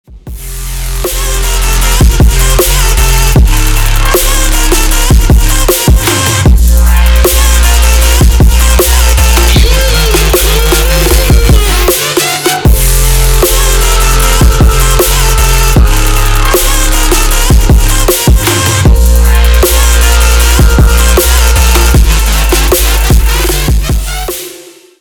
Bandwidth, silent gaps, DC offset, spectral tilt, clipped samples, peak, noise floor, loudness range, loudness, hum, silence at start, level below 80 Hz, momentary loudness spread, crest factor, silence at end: over 20 kHz; none; under 0.1%; -3.5 dB/octave; 0.9%; 0 dBFS; -32 dBFS; 2 LU; -8 LUFS; none; 0.1 s; -8 dBFS; 4 LU; 6 dB; 0.4 s